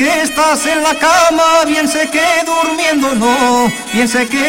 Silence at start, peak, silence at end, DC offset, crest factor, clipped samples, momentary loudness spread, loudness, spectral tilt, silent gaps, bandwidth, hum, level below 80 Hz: 0 s; 0 dBFS; 0 s; under 0.1%; 12 dB; under 0.1%; 4 LU; -11 LUFS; -2.5 dB/octave; none; 16.5 kHz; none; -44 dBFS